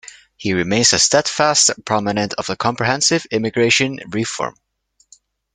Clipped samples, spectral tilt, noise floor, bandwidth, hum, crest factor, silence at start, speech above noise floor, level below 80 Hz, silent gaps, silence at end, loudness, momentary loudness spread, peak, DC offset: under 0.1%; -2.5 dB/octave; -62 dBFS; 11 kHz; none; 18 dB; 0.05 s; 44 dB; -54 dBFS; none; 1.05 s; -16 LUFS; 10 LU; 0 dBFS; under 0.1%